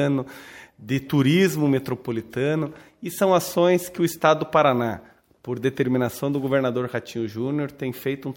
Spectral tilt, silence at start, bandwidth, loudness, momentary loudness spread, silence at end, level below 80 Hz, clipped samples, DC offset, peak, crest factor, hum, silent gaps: -6 dB/octave; 0 s; 17 kHz; -23 LUFS; 14 LU; 0 s; -62 dBFS; under 0.1%; under 0.1%; -2 dBFS; 20 dB; none; none